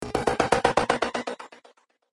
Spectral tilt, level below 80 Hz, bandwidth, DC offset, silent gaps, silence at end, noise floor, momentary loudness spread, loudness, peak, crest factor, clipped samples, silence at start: -4 dB/octave; -48 dBFS; 11.5 kHz; under 0.1%; none; 0.55 s; -59 dBFS; 17 LU; -25 LUFS; -4 dBFS; 22 dB; under 0.1%; 0 s